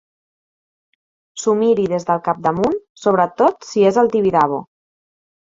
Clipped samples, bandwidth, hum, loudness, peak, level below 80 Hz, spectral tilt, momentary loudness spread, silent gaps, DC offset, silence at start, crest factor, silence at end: under 0.1%; 7.8 kHz; none; -17 LUFS; -2 dBFS; -56 dBFS; -6 dB/octave; 6 LU; 2.89-2.95 s; under 0.1%; 1.35 s; 18 dB; 0.95 s